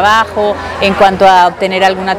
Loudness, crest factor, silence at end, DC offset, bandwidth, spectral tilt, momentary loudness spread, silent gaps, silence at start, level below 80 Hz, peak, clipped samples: -9 LUFS; 10 dB; 0 s; under 0.1%; 16.5 kHz; -4.5 dB/octave; 7 LU; none; 0 s; -38 dBFS; 0 dBFS; 3%